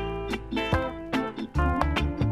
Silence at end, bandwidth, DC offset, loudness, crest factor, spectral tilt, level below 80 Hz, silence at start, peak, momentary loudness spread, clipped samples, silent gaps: 0 s; 13.5 kHz; under 0.1%; -28 LUFS; 20 dB; -7 dB/octave; -34 dBFS; 0 s; -6 dBFS; 5 LU; under 0.1%; none